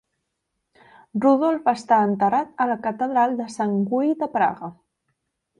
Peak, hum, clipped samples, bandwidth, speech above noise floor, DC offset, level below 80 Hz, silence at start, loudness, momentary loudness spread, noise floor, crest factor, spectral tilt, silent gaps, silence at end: -6 dBFS; none; under 0.1%; 10.5 kHz; 57 dB; under 0.1%; -68 dBFS; 1.15 s; -21 LUFS; 7 LU; -78 dBFS; 16 dB; -7 dB/octave; none; 0.85 s